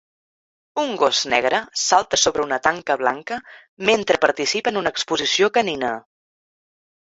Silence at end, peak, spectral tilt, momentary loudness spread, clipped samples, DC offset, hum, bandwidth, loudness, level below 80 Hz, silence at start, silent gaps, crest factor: 1 s; -2 dBFS; -1.5 dB/octave; 9 LU; under 0.1%; under 0.1%; none; 8 kHz; -19 LUFS; -58 dBFS; 0.75 s; 3.68-3.77 s; 20 dB